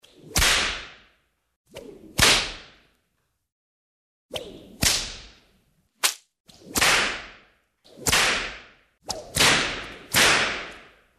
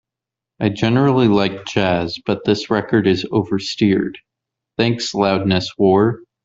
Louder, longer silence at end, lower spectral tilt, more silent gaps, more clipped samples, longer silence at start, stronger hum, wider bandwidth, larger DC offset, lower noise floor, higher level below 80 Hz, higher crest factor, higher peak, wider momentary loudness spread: second, -21 LUFS vs -17 LUFS; first, 0.4 s vs 0.25 s; second, -1 dB/octave vs -6.5 dB/octave; first, 1.56-1.65 s, 3.52-4.29 s, 6.40-6.45 s vs none; neither; second, 0.25 s vs 0.6 s; neither; first, 14 kHz vs 7.8 kHz; neither; second, -74 dBFS vs -86 dBFS; first, -44 dBFS vs -52 dBFS; first, 24 dB vs 16 dB; second, -4 dBFS vs 0 dBFS; first, 23 LU vs 7 LU